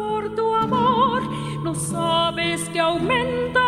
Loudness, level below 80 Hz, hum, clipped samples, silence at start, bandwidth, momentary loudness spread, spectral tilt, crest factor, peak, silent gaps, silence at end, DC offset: -21 LUFS; -48 dBFS; none; under 0.1%; 0 s; 14 kHz; 7 LU; -4.5 dB/octave; 14 dB; -6 dBFS; none; 0 s; under 0.1%